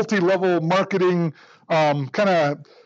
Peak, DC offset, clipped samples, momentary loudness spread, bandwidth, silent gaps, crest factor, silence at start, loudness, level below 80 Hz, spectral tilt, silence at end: -10 dBFS; under 0.1%; under 0.1%; 5 LU; 7.8 kHz; none; 12 dB; 0 s; -20 LUFS; -80 dBFS; -6.5 dB/octave; 0.2 s